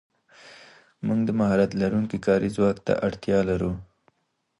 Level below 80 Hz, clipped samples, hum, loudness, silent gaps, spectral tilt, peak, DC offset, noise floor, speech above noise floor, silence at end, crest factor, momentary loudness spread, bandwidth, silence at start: -50 dBFS; under 0.1%; none; -24 LUFS; none; -7.5 dB/octave; -8 dBFS; under 0.1%; -74 dBFS; 51 dB; 0.75 s; 16 dB; 6 LU; 11.5 kHz; 0.45 s